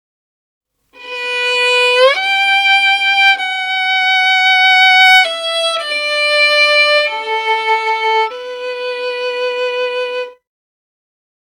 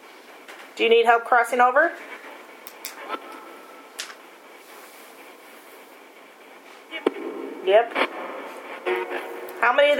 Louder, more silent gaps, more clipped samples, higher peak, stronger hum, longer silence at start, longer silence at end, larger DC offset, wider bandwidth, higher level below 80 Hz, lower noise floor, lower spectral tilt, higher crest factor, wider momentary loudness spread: first, -11 LUFS vs -22 LUFS; neither; neither; about the same, 0 dBFS vs -2 dBFS; neither; first, 1 s vs 0.05 s; first, 1.15 s vs 0 s; neither; about the same, 17.5 kHz vs 18 kHz; first, -68 dBFS vs under -90 dBFS; second, -36 dBFS vs -47 dBFS; second, 3 dB/octave vs -1.5 dB/octave; second, 14 dB vs 22 dB; second, 13 LU vs 26 LU